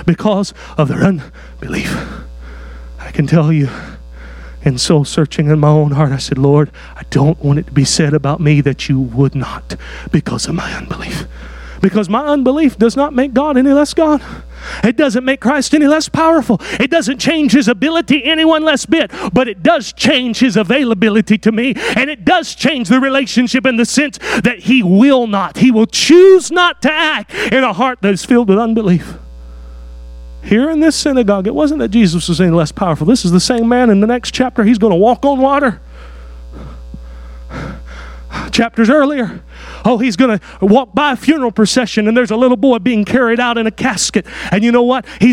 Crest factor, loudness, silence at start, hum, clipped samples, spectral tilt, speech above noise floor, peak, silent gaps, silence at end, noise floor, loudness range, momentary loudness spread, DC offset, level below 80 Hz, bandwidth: 12 dB; -12 LUFS; 0 s; none; under 0.1%; -5.5 dB/octave; 19 dB; 0 dBFS; none; 0 s; -31 dBFS; 7 LU; 16 LU; under 0.1%; -34 dBFS; 14 kHz